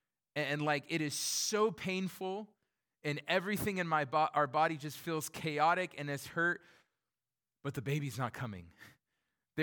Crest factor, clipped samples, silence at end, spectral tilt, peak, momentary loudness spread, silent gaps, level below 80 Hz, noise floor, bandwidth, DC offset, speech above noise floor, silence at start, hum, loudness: 20 dB; under 0.1%; 0 s; -4 dB/octave; -18 dBFS; 12 LU; none; -72 dBFS; under -90 dBFS; 19 kHz; under 0.1%; over 55 dB; 0.35 s; none; -35 LUFS